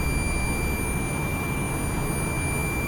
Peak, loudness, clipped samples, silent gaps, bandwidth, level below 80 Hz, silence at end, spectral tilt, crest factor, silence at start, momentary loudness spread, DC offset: -14 dBFS; -27 LUFS; under 0.1%; none; over 20 kHz; -32 dBFS; 0 s; -5 dB/octave; 12 dB; 0 s; 1 LU; under 0.1%